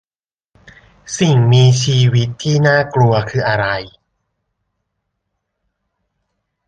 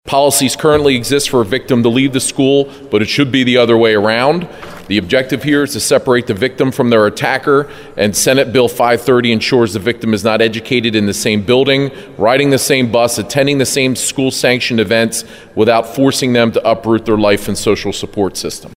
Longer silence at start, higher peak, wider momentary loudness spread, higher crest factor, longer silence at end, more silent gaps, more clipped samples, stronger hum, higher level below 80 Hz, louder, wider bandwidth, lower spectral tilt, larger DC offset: first, 1.05 s vs 0.05 s; about the same, -2 dBFS vs 0 dBFS; about the same, 7 LU vs 6 LU; about the same, 14 dB vs 12 dB; first, 2.8 s vs 0.05 s; neither; neither; neither; about the same, -48 dBFS vs -44 dBFS; about the same, -14 LUFS vs -12 LUFS; second, 9.2 kHz vs 16.5 kHz; first, -5.5 dB/octave vs -4 dB/octave; neither